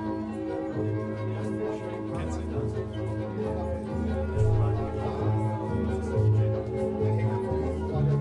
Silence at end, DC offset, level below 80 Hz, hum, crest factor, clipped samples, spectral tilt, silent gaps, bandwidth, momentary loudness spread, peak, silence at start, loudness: 0 s; under 0.1%; -42 dBFS; none; 14 dB; under 0.1%; -9 dB/octave; none; 10 kHz; 7 LU; -14 dBFS; 0 s; -29 LUFS